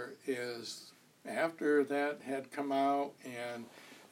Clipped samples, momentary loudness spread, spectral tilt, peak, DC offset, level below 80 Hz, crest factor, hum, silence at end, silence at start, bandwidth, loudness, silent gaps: under 0.1%; 18 LU; -4.5 dB/octave; -18 dBFS; under 0.1%; under -90 dBFS; 18 dB; none; 0.05 s; 0 s; 16 kHz; -36 LUFS; none